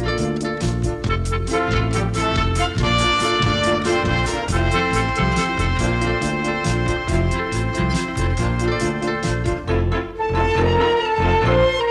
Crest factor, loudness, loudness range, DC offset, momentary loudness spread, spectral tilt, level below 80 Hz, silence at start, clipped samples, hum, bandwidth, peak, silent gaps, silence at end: 14 dB; -20 LUFS; 2 LU; under 0.1%; 5 LU; -5.5 dB/octave; -28 dBFS; 0 s; under 0.1%; none; 12 kHz; -4 dBFS; none; 0 s